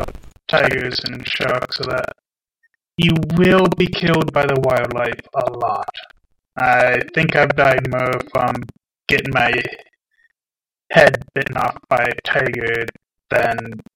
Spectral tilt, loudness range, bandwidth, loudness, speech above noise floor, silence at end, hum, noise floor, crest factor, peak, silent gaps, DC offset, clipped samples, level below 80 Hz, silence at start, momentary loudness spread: -6 dB/octave; 2 LU; 17 kHz; -17 LUFS; over 73 dB; 0.15 s; none; under -90 dBFS; 18 dB; 0 dBFS; none; under 0.1%; under 0.1%; -44 dBFS; 0 s; 14 LU